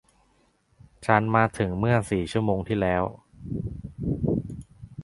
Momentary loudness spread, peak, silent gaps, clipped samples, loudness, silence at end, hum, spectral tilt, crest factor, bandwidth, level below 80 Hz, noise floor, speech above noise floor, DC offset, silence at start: 14 LU; -2 dBFS; none; under 0.1%; -26 LUFS; 0 s; none; -7.5 dB/octave; 24 dB; 11.5 kHz; -44 dBFS; -65 dBFS; 41 dB; under 0.1%; 1 s